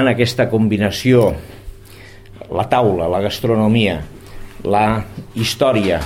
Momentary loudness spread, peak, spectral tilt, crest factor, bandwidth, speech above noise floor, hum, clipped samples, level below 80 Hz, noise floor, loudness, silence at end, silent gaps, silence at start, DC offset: 13 LU; 0 dBFS; -6 dB/octave; 16 dB; 16.5 kHz; 23 dB; none; under 0.1%; -38 dBFS; -38 dBFS; -16 LUFS; 0 s; none; 0 s; under 0.1%